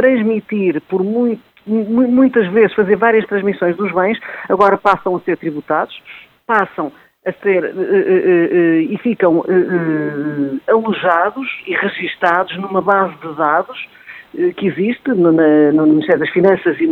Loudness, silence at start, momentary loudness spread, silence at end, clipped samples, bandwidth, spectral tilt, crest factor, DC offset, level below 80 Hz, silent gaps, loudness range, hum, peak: -15 LUFS; 0 s; 9 LU; 0 s; under 0.1%; 4.9 kHz; -8.5 dB/octave; 14 dB; under 0.1%; -60 dBFS; none; 3 LU; none; 0 dBFS